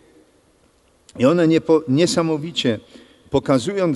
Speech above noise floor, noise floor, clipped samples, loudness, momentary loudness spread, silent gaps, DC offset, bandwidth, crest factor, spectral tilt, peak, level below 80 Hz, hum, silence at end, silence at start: 40 dB; -57 dBFS; under 0.1%; -19 LUFS; 7 LU; none; under 0.1%; 11.5 kHz; 16 dB; -5.5 dB/octave; -4 dBFS; -52 dBFS; none; 0 s; 1.15 s